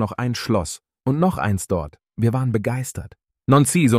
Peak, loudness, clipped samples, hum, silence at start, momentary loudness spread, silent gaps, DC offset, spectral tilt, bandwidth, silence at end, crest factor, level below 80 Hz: -4 dBFS; -21 LUFS; under 0.1%; none; 0 s; 15 LU; none; under 0.1%; -6 dB/octave; 16 kHz; 0 s; 16 dB; -44 dBFS